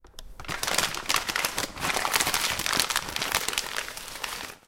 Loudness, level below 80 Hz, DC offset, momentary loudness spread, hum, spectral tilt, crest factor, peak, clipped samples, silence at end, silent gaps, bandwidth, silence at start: -27 LUFS; -50 dBFS; under 0.1%; 10 LU; none; -0.5 dB/octave; 26 dB; -2 dBFS; under 0.1%; 0.1 s; none; 17 kHz; 0.05 s